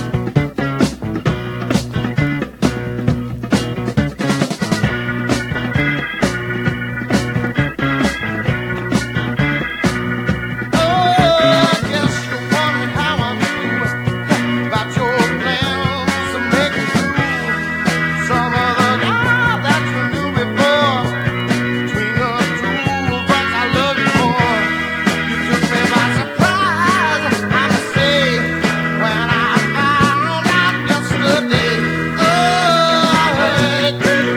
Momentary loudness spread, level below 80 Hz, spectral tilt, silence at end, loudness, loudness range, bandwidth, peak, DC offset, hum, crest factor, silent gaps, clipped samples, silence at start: 6 LU; -38 dBFS; -5 dB/octave; 0 s; -16 LUFS; 4 LU; 18.5 kHz; 0 dBFS; under 0.1%; none; 16 dB; none; under 0.1%; 0 s